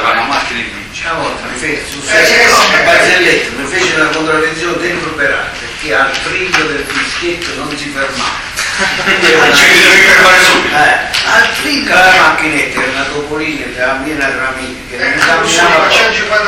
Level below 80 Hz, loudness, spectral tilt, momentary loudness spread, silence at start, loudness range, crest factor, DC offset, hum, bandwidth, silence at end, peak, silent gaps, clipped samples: -36 dBFS; -9 LUFS; -2 dB/octave; 13 LU; 0 s; 8 LU; 10 dB; under 0.1%; none; over 20 kHz; 0 s; 0 dBFS; none; 0.4%